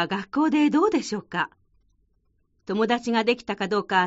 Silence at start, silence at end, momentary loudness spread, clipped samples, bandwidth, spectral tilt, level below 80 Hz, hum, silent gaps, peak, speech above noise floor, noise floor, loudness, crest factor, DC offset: 0 s; 0 s; 9 LU; under 0.1%; 8 kHz; -3 dB/octave; -64 dBFS; none; none; -8 dBFS; 45 dB; -68 dBFS; -24 LUFS; 18 dB; under 0.1%